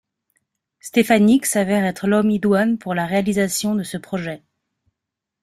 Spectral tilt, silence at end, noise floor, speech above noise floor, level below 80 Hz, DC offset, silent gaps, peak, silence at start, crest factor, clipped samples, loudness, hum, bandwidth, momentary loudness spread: -5 dB/octave; 1.05 s; -83 dBFS; 65 dB; -58 dBFS; under 0.1%; none; -2 dBFS; 0.85 s; 18 dB; under 0.1%; -19 LUFS; none; 15.5 kHz; 12 LU